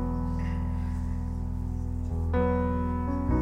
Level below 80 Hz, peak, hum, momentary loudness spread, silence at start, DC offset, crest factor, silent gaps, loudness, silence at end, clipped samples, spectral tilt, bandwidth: -34 dBFS; -14 dBFS; none; 7 LU; 0 s; under 0.1%; 14 dB; none; -30 LUFS; 0 s; under 0.1%; -9.5 dB/octave; 6 kHz